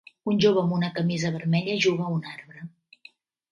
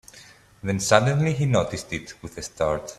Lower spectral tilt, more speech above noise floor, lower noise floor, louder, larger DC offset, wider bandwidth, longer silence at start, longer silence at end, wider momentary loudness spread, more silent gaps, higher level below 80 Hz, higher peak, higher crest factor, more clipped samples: about the same, -6 dB/octave vs -5 dB/octave; first, 30 dB vs 26 dB; first, -55 dBFS vs -50 dBFS; about the same, -25 LUFS vs -23 LUFS; neither; second, 7.4 kHz vs 14 kHz; about the same, 0.25 s vs 0.15 s; first, 0.85 s vs 0.05 s; first, 20 LU vs 16 LU; neither; second, -66 dBFS vs -50 dBFS; second, -8 dBFS vs 0 dBFS; second, 18 dB vs 24 dB; neither